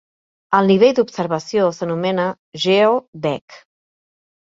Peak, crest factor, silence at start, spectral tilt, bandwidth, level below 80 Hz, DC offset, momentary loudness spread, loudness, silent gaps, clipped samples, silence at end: 0 dBFS; 18 dB; 0.5 s; -6 dB/octave; 7.8 kHz; -64 dBFS; under 0.1%; 11 LU; -17 LUFS; 2.39-2.52 s, 3.08-3.13 s, 3.41-3.48 s; under 0.1%; 0.95 s